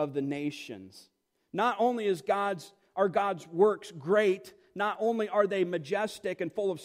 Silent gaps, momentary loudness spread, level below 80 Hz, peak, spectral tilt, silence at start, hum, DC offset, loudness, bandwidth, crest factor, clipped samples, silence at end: none; 13 LU; -78 dBFS; -12 dBFS; -5.5 dB/octave; 0 s; none; under 0.1%; -30 LUFS; 15.5 kHz; 18 dB; under 0.1%; 0 s